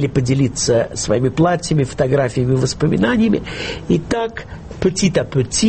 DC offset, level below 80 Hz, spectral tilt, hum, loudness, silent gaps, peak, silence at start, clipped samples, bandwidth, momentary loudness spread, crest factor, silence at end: under 0.1%; -38 dBFS; -5.5 dB/octave; none; -17 LUFS; none; -2 dBFS; 0 s; under 0.1%; 8.8 kHz; 6 LU; 14 dB; 0 s